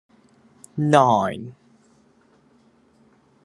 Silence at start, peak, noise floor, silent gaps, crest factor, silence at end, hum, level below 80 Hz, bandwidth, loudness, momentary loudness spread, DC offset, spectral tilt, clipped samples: 0.75 s; 0 dBFS; -58 dBFS; none; 24 dB; 1.95 s; none; -70 dBFS; 12 kHz; -19 LUFS; 20 LU; under 0.1%; -6.5 dB/octave; under 0.1%